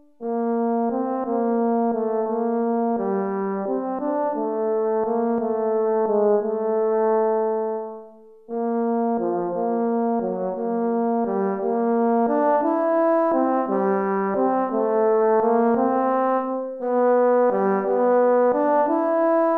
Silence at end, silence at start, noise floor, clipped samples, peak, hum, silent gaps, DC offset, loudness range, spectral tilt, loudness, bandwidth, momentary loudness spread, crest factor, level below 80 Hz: 0 s; 0.2 s; -45 dBFS; under 0.1%; -8 dBFS; none; none; under 0.1%; 4 LU; -10.5 dB/octave; -22 LUFS; 3.4 kHz; 6 LU; 12 dB; -66 dBFS